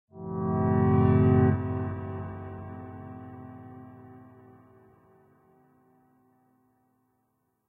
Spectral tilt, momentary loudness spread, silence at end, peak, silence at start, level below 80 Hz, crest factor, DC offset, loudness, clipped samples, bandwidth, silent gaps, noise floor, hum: -13 dB/octave; 25 LU; 3.5 s; -10 dBFS; 0.15 s; -56 dBFS; 20 dB; under 0.1%; -26 LUFS; under 0.1%; 3.6 kHz; none; -75 dBFS; none